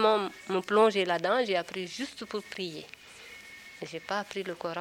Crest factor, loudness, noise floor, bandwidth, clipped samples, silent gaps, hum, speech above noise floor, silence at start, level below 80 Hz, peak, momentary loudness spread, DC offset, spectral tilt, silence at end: 20 dB; -30 LUFS; -49 dBFS; 16.5 kHz; under 0.1%; none; none; 20 dB; 0 s; -72 dBFS; -10 dBFS; 21 LU; under 0.1%; -4 dB/octave; 0 s